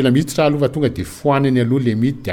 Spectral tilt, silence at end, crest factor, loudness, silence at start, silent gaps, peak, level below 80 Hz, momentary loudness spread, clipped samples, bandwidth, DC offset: -7 dB/octave; 0 s; 14 dB; -17 LUFS; 0 s; none; -4 dBFS; -44 dBFS; 5 LU; under 0.1%; 17 kHz; under 0.1%